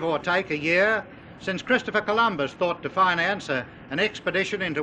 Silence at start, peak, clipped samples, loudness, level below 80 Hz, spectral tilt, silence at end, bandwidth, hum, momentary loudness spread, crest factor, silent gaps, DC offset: 0 s; -6 dBFS; under 0.1%; -24 LUFS; -58 dBFS; -5 dB/octave; 0 s; 9.8 kHz; none; 9 LU; 18 dB; none; under 0.1%